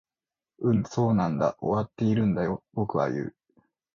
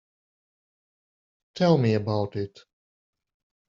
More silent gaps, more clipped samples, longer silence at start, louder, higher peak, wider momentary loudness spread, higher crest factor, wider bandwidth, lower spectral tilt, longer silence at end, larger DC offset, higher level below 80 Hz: neither; neither; second, 0.6 s vs 1.55 s; second, -27 LUFS vs -24 LUFS; second, -10 dBFS vs -6 dBFS; second, 6 LU vs 16 LU; second, 16 dB vs 22 dB; about the same, 7.2 kHz vs 7.4 kHz; first, -8.5 dB/octave vs -7 dB/octave; second, 0.65 s vs 1.2 s; neither; first, -56 dBFS vs -64 dBFS